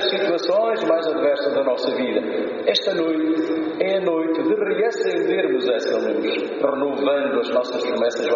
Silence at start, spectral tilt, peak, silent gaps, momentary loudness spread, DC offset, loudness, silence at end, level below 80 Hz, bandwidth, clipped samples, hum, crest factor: 0 s; -2 dB/octave; -4 dBFS; none; 3 LU; under 0.1%; -21 LUFS; 0 s; -70 dBFS; 7.2 kHz; under 0.1%; none; 16 dB